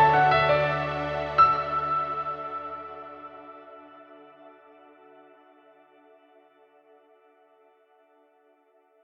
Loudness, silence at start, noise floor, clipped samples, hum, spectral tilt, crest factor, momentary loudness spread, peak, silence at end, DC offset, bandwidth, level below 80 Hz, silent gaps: -24 LUFS; 0 s; -63 dBFS; under 0.1%; none; -6.5 dB/octave; 20 dB; 26 LU; -8 dBFS; 4.55 s; under 0.1%; 7 kHz; -56 dBFS; none